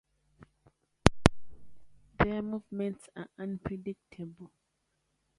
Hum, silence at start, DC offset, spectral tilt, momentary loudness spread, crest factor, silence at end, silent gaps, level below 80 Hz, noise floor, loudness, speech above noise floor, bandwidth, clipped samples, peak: none; 0.4 s; under 0.1%; -5.5 dB/octave; 19 LU; 34 dB; 0.95 s; none; -46 dBFS; -79 dBFS; -32 LUFS; 41 dB; 11.5 kHz; under 0.1%; 0 dBFS